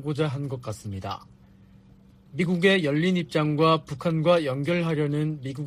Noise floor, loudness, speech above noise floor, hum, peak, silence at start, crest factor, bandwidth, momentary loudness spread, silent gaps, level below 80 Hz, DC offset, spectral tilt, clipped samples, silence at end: -53 dBFS; -25 LUFS; 29 dB; none; -8 dBFS; 0 s; 18 dB; 13.5 kHz; 14 LU; none; -60 dBFS; under 0.1%; -7 dB/octave; under 0.1%; 0 s